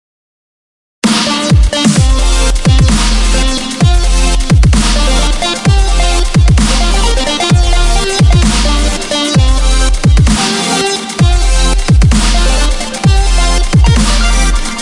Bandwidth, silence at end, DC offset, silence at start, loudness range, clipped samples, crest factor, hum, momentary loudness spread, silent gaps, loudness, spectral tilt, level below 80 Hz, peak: 11.5 kHz; 0 s; under 0.1%; 1.05 s; 1 LU; under 0.1%; 8 dB; none; 4 LU; none; -10 LUFS; -4.5 dB/octave; -10 dBFS; 0 dBFS